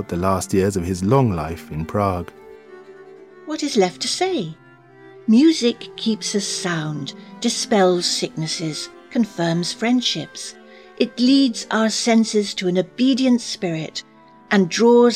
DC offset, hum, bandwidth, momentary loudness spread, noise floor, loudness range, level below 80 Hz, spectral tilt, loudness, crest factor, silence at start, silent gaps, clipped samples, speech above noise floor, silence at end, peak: under 0.1%; none; 14.5 kHz; 13 LU; -46 dBFS; 5 LU; -50 dBFS; -4.5 dB/octave; -20 LUFS; 16 dB; 0 s; none; under 0.1%; 27 dB; 0 s; -2 dBFS